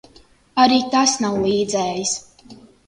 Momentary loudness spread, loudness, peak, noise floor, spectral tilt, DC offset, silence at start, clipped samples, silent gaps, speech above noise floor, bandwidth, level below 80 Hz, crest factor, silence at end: 9 LU; -18 LUFS; 0 dBFS; -51 dBFS; -3 dB/octave; under 0.1%; 0.55 s; under 0.1%; none; 33 dB; 11 kHz; -54 dBFS; 20 dB; 0.35 s